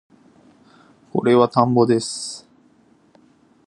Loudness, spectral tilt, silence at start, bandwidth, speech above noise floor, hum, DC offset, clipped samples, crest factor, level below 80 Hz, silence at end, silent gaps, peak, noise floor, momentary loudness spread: -18 LUFS; -6 dB/octave; 1.15 s; 11.5 kHz; 38 dB; none; under 0.1%; under 0.1%; 22 dB; -64 dBFS; 1.3 s; none; 0 dBFS; -56 dBFS; 14 LU